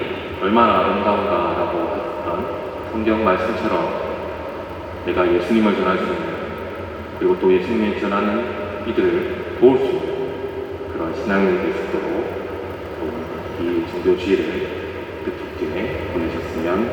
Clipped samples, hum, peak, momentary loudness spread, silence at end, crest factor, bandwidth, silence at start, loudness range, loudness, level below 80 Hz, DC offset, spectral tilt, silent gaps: under 0.1%; none; 0 dBFS; 12 LU; 0 s; 20 dB; 19 kHz; 0 s; 4 LU; -21 LUFS; -46 dBFS; under 0.1%; -7 dB/octave; none